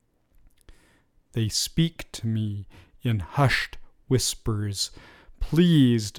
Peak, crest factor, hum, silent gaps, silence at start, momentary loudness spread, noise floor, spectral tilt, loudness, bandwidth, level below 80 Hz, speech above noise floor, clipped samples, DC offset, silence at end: -8 dBFS; 18 dB; none; none; 0.7 s; 13 LU; -62 dBFS; -5 dB/octave; -25 LUFS; 17 kHz; -42 dBFS; 37 dB; under 0.1%; under 0.1%; 0 s